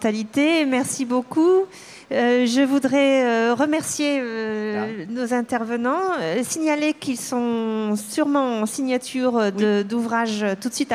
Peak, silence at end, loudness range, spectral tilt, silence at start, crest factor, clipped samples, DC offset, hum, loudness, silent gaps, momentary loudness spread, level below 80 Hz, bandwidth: -8 dBFS; 0 s; 4 LU; -4 dB/octave; 0 s; 14 dB; under 0.1%; under 0.1%; none; -21 LUFS; none; 7 LU; -68 dBFS; 15.5 kHz